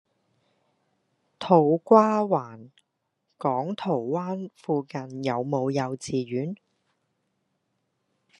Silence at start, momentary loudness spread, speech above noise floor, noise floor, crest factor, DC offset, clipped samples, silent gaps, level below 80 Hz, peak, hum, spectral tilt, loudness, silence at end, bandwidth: 1.4 s; 16 LU; 53 dB; -78 dBFS; 24 dB; under 0.1%; under 0.1%; none; -74 dBFS; -4 dBFS; none; -7 dB/octave; -25 LUFS; 1.85 s; 11 kHz